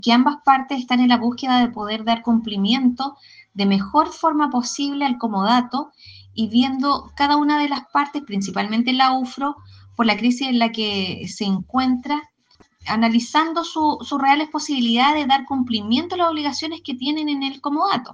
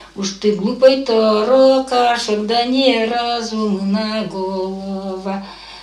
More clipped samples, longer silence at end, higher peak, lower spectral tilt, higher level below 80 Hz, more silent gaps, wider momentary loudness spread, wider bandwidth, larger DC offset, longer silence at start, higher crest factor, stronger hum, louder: neither; about the same, 0 s vs 0 s; about the same, -2 dBFS vs 0 dBFS; about the same, -4.5 dB/octave vs -5 dB/octave; second, -58 dBFS vs -52 dBFS; neither; second, 9 LU vs 13 LU; second, 9.2 kHz vs 11.5 kHz; neither; about the same, 0.05 s vs 0 s; about the same, 18 dB vs 16 dB; neither; second, -20 LUFS vs -16 LUFS